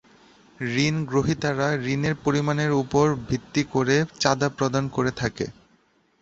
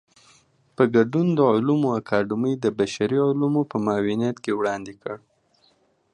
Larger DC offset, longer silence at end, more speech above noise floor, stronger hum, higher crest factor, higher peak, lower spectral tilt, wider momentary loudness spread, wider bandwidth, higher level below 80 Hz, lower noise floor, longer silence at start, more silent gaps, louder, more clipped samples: neither; second, 0.7 s vs 0.95 s; about the same, 40 dB vs 41 dB; neither; about the same, 22 dB vs 18 dB; about the same, -2 dBFS vs -4 dBFS; second, -5.5 dB/octave vs -7 dB/octave; second, 6 LU vs 10 LU; second, 8 kHz vs 10 kHz; first, -50 dBFS vs -62 dBFS; about the same, -63 dBFS vs -63 dBFS; second, 0.6 s vs 0.8 s; neither; about the same, -24 LUFS vs -22 LUFS; neither